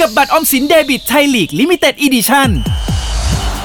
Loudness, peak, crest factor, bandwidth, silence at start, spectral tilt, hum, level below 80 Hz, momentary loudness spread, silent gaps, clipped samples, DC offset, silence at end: -11 LUFS; 0 dBFS; 12 dB; over 20 kHz; 0 s; -4 dB/octave; none; -22 dBFS; 7 LU; none; under 0.1%; under 0.1%; 0 s